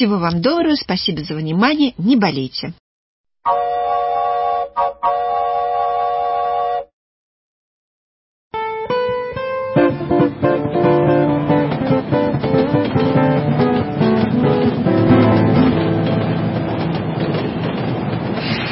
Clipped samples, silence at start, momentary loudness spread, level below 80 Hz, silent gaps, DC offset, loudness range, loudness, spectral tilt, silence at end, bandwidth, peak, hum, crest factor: under 0.1%; 0 s; 7 LU; -42 dBFS; 2.80-3.24 s, 6.93-8.51 s; under 0.1%; 7 LU; -17 LUFS; -11 dB/octave; 0 s; 5.8 kHz; -2 dBFS; none; 16 dB